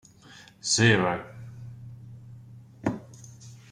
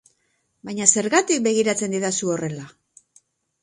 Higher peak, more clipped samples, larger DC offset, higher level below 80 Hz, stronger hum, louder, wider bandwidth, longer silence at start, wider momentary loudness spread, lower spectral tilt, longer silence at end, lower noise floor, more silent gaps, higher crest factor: second, -8 dBFS vs 0 dBFS; neither; neither; first, -60 dBFS vs -68 dBFS; neither; second, -25 LUFS vs -20 LUFS; about the same, 11.5 kHz vs 11.5 kHz; about the same, 0.65 s vs 0.65 s; first, 27 LU vs 15 LU; about the same, -4 dB/octave vs -3 dB/octave; second, 0.15 s vs 0.95 s; second, -52 dBFS vs -70 dBFS; neither; about the same, 22 dB vs 24 dB